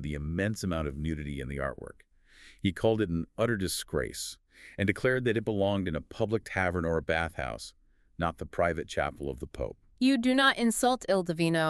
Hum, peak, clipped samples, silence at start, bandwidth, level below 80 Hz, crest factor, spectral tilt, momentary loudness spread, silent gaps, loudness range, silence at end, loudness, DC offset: none; -10 dBFS; under 0.1%; 0 s; 13.5 kHz; -48 dBFS; 20 dB; -5 dB/octave; 12 LU; none; 4 LU; 0 s; -30 LUFS; under 0.1%